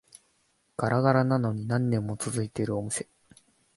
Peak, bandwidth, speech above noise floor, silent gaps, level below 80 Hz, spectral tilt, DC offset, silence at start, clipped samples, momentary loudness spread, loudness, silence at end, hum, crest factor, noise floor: -8 dBFS; 11.5 kHz; 43 dB; none; -60 dBFS; -6.5 dB/octave; under 0.1%; 0.8 s; under 0.1%; 10 LU; -28 LUFS; 0.75 s; none; 22 dB; -70 dBFS